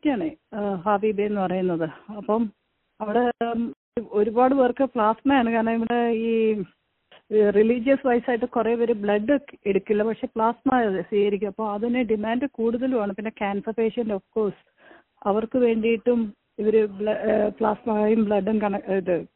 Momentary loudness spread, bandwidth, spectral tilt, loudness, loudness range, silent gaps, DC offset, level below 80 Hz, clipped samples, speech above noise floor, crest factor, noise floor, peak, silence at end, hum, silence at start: 8 LU; 4.1 kHz; -5.5 dB/octave; -23 LUFS; 4 LU; 3.77-3.92 s; under 0.1%; -58 dBFS; under 0.1%; 34 dB; 16 dB; -57 dBFS; -8 dBFS; 0.1 s; none; 0.05 s